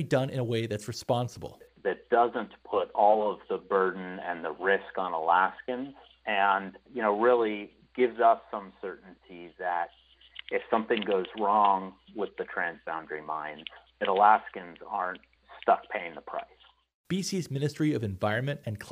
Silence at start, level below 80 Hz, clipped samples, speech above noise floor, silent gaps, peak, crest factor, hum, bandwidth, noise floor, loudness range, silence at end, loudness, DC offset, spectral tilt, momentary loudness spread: 0 s; -68 dBFS; under 0.1%; 21 dB; 16.94-17.04 s; -8 dBFS; 22 dB; none; 15.5 kHz; -49 dBFS; 4 LU; 0 s; -29 LUFS; under 0.1%; -5.5 dB/octave; 16 LU